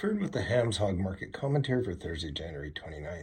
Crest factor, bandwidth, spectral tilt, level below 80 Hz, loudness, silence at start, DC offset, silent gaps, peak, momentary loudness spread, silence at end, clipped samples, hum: 18 dB; 10.5 kHz; -6 dB/octave; -50 dBFS; -32 LUFS; 0 s; under 0.1%; none; -14 dBFS; 11 LU; 0 s; under 0.1%; none